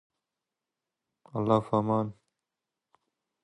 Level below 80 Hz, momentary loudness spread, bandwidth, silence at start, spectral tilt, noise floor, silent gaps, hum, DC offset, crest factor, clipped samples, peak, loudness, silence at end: -66 dBFS; 12 LU; 8.8 kHz; 1.35 s; -9 dB/octave; -88 dBFS; none; none; under 0.1%; 24 dB; under 0.1%; -10 dBFS; -28 LUFS; 1.3 s